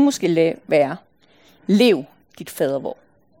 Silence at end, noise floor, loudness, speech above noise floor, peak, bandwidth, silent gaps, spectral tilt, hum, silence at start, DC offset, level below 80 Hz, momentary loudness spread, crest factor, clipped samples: 0.45 s; -55 dBFS; -19 LUFS; 36 dB; -4 dBFS; 17 kHz; none; -5.5 dB/octave; none; 0 s; under 0.1%; -68 dBFS; 19 LU; 16 dB; under 0.1%